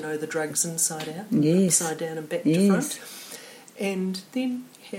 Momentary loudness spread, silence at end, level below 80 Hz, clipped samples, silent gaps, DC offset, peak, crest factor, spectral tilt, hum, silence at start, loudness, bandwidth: 16 LU; 0 s; -72 dBFS; under 0.1%; none; under 0.1%; -8 dBFS; 18 dB; -4.5 dB/octave; none; 0 s; -25 LUFS; 16.5 kHz